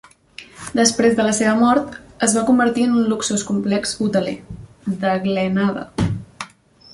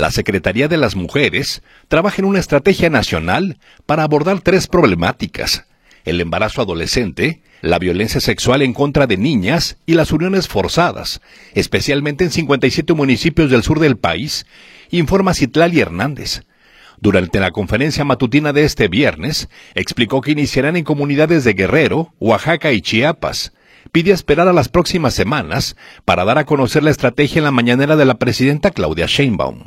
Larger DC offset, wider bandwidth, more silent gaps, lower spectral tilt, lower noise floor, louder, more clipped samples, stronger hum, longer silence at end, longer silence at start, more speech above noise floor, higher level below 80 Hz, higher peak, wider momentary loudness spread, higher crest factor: neither; second, 11.5 kHz vs 16 kHz; neither; about the same, -4.5 dB/octave vs -5.5 dB/octave; about the same, -45 dBFS vs -46 dBFS; second, -18 LUFS vs -15 LUFS; neither; neither; first, 0.5 s vs 0.05 s; first, 0.4 s vs 0 s; second, 28 dB vs 32 dB; second, -46 dBFS vs -36 dBFS; about the same, -2 dBFS vs 0 dBFS; first, 18 LU vs 8 LU; about the same, 18 dB vs 14 dB